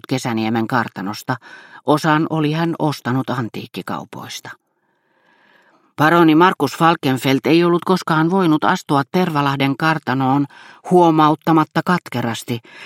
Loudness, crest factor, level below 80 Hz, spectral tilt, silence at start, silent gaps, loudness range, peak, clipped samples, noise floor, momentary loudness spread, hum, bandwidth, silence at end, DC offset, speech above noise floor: -17 LUFS; 18 dB; -62 dBFS; -6 dB/octave; 0.1 s; none; 8 LU; 0 dBFS; under 0.1%; -65 dBFS; 14 LU; none; 16.5 kHz; 0 s; under 0.1%; 48 dB